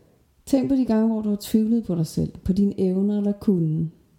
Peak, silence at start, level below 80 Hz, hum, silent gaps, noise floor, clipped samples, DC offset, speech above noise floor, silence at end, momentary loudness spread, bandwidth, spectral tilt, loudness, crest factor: -8 dBFS; 0.45 s; -46 dBFS; none; none; -48 dBFS; under 0.1%; under 0.1%; 26 dB; 0.3 s; 5 LU; 17 kHz; -8 dB/octave; -23 LUFS; 16 dB